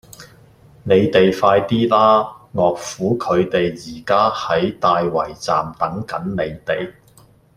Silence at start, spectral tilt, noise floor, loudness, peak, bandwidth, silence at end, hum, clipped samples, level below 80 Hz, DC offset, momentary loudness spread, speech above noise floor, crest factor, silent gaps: 0.2 s; -6 dB/octave; -50 dBFS; -18 LUFS; -2 dBFS; 16 kHz; 0.65 s; none; under 0.1%; -50 dBFS; under 0.1%; 10 LU; 33 dB; 16 dB; none